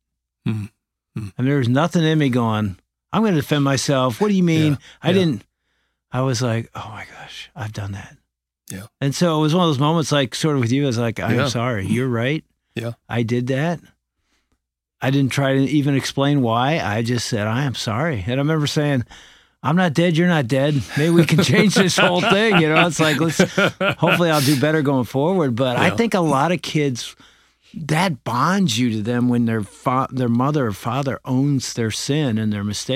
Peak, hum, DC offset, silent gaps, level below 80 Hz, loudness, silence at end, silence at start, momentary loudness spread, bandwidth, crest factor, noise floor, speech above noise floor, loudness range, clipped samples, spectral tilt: -2 dBFS; none; under 0.1%; none; -54 dBFS; -19 LUFS; 0 s; 0.45 s; 14 LU; 16 kHz; 18 dB; -72 dBFS; 53 dB; 8 LU; under 0.1%; -5.5 dB/octave